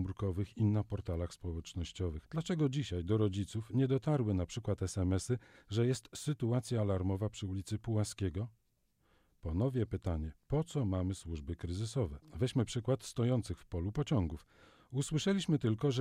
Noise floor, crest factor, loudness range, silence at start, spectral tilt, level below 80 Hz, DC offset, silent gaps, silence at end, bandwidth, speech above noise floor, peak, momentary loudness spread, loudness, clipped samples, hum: -75 dBFS; 16 dB; 3 LU; 0 s; -6.5 dB/octave; -52 dBFS; under 0.1%; none; 0 s; 15 kHz; 40 dB; -20 dBFS; 8 LU; -36 LUFS; under 0.1%; none